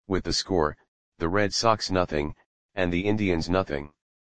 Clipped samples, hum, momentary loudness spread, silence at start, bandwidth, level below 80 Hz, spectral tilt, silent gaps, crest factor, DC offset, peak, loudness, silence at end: under 0.1%; none; 10 LU; 0 s; 10 kHz; -44 dBFS; -4.5 dB/octave; 0.88-1.12 s, 2.46-2.69 s; 20 dB; 0.7%; -6 dBFS; -26 LUFS; 0.25 s